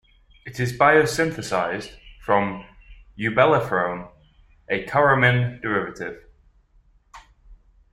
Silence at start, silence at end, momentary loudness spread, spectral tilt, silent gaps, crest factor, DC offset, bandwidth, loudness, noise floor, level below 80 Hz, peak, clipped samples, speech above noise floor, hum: 0.45 s; 0.35 s; 19 LU; -5.5 dB/octave; none; 22 dB; under 0.1%; 14 kHz; -21 LUFS; -58 dBFS; -50 dBFS; -2 dBFS; under 0.1%; 37 dB; none